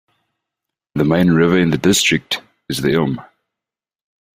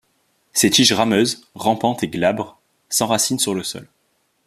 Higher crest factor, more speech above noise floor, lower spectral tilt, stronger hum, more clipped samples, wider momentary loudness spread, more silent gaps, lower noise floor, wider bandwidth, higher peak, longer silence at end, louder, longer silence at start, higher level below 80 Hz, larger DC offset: about the same, 16 dB vs 20 dB; first, 73 dB vs 47 dB; first, -4.5 dB/octave vs -3 dB/octave; neither; neither; about the same, 12 LU vs 13 LU; neither; first, -88 dBFS vs -66 dBFS; about the same, 15.5 kHz vs 15 kHz; about the same, -2 dBFS vs 0 dBFS; first, 1.15 s vs 0.6 s; about the same, -16 LUFS vs -18 LUFS; first, 0.95 s vs 0.55 s; first, -48 dBFS vs -58 dBFS; neither